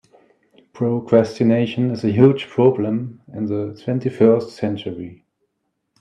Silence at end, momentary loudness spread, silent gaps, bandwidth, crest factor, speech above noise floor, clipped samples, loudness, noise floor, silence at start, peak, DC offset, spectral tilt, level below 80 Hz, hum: 0.85 s; 13 LU; none; 9.4 kHz; 18 dB; 56 dB; under 0.1%; -19 LUFS; -74 dBFS; 0.75 s; 0 dBFS; under 0.1%; -8.5 dB/octave; -64 dBFS; none